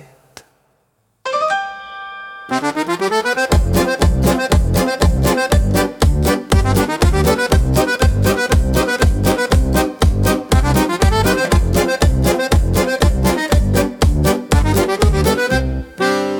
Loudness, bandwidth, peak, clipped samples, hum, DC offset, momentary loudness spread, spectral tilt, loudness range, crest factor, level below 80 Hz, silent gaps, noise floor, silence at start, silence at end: -15 LUFS; 19 kHz; -2 dBFS; under 0.1%; none; under 0.1%; 5 LU; -5.5 dB/octave; 3 LU; 12 dB; -20 dBFS; none; -63 dBFS; 1.25 s; 0 s